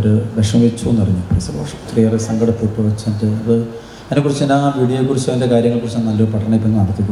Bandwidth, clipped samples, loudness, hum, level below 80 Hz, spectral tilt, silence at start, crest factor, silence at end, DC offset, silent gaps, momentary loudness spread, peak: 12 kHz; under 0.1%; -16 LUFS; none; -40 dBFS; -7.5 dB/octave; 0 s; 14 dB; 0 s; under 0.1%; none; 5 LU; -2 dBFS